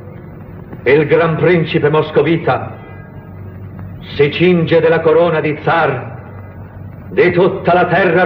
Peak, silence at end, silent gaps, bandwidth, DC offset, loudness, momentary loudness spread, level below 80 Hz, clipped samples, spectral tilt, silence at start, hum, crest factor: 0 dBFS; 0 s; none; 5.6 kHz; under 0.1%; -13 LUFS; 21 LU; -46 dBFS; under 0.1%; -9.5 dB/octave; 0 s; none; 14 dB